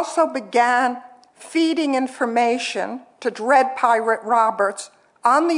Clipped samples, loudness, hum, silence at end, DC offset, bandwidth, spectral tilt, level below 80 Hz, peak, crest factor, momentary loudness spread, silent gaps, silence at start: under 0.1%; -20 LUFS; none; 0 s; under 0.1%; 11 kHz; -3 dB/octave; -82 dBFS; -2 dBFS; 18 dB; 11 LU; none; 0 s